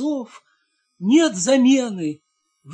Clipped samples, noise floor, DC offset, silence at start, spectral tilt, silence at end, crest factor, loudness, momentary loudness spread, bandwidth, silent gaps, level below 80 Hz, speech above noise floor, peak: under 0.1%; -68 dBFS; under 0.1%; 0 s; -4 dB/octave; 0 s; 16 dB; -19 LUFS; 17 LU; 10 kHz; none; -72 dBFS; 49 dB; -6 dBFS